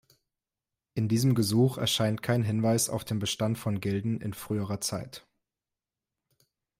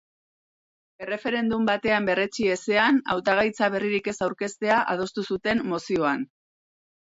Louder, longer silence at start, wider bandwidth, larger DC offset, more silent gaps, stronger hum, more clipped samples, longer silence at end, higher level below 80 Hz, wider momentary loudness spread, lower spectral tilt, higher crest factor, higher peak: second, -28 LUFS vs -24 LUFS; about the same, 0.95 s vs 1 s; first, 16 kHz vs 8 kHz; neither; neither; neither; neither; first, 1.6 s vs 0.8 s; about the same, -64 dBFS vs -60 dBFS; about the same, 9 LU vs 7 LU; about the same, -5 dB/octave vs -4.5 dB/octave; about the same, 16 dB vs 16 dB; second, -14 dBFS vs -8 dBFS